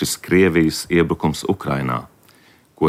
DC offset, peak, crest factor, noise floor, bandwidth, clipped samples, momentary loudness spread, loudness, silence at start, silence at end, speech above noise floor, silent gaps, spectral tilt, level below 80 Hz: under 0.1%; -4 dBFS; 16 dB; -52 dBFS; 16 kHz; under 0.1%; 8 LU; -19 LUFS; 0 s; 0 s; 34 dB; none; -5.5 dB/octave; -44 dBFS